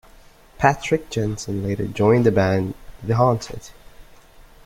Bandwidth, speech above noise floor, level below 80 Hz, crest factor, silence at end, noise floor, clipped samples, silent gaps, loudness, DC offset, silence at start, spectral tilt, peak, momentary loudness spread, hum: 16 kHz; 28 dB; -44 dBFS; 20 dB; 0.6 s; -48 dBFS; under 0.1%; none; -20 LUFS; under 0.1%; 0.6 s; -6.5 dB/octave; -2 dBFS; 13 LU; none